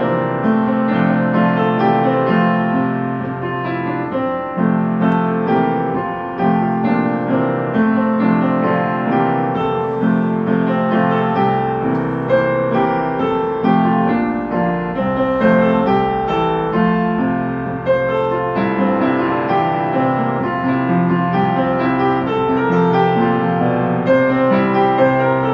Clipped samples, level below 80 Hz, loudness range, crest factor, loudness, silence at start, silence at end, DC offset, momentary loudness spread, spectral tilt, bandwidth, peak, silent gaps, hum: under 0.1%; -46 dBFS; 2 LU; 14 dB; -16 LUFS; 0 s; 0 s; under 0.1%; 5 LU; -9.5 dB/octave; 5.6 kHz; 0 dBFS; none; none